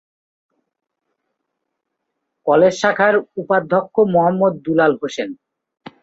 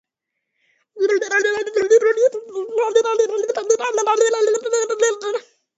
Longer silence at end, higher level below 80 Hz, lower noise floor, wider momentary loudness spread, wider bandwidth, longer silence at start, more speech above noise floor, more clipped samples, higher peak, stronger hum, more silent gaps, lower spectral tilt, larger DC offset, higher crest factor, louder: first, 0.7 s vs 0.35 s; first, -62 dBFS vs -72 dBFS; about the same, -77 dBFS vs -79 dBFS; first, 11 LU vs 8 LU; about the same, 8 kHz vs 8.2 kHz; first, 2.45 s vs 0.95 s; about the same, 61 dB vs 61 dB; neither; about the same, -2 dBFS vs -4 dBFS; neither; neither; first, -6 dB/octave vs -0.5 dB/octave; neither; about the same, 18 dB vs 16 dB; about the same, -16 LUFS vs -18 LUFS